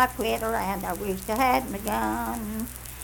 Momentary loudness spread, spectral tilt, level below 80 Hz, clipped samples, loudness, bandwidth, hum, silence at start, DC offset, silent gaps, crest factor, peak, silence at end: 9 LU; -4 dB/octave; -42 dBFS; under 0.1%; -27 LUFS; 19 kHz; none; 0 s; under 0.1%; none; 22 dB; -6 dBFS; 0 s